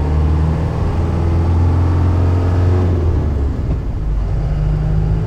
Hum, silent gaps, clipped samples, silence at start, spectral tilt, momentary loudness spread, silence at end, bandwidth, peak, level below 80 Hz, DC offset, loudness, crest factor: none; none; under 0.1%; 0 s; -9.5 dB/octave; 6 LU; 0 s; 6.4 kHz; -6 dBFS; -20 dBFS; under 0.1%; -16 LUFS; 8 dB